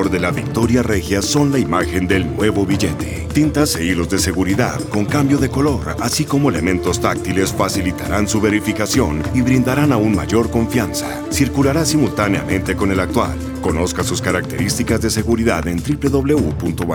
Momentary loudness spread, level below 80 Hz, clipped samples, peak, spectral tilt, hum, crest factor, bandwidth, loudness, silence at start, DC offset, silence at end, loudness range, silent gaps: 4 LU; -32 dBFS; under 0.1%; 0 dBFS; -5 dB/octave; none; 16 dB; over 20 kHz; -17 LUFS; 0 s; under 0.1%; 0 s; 2 LU; none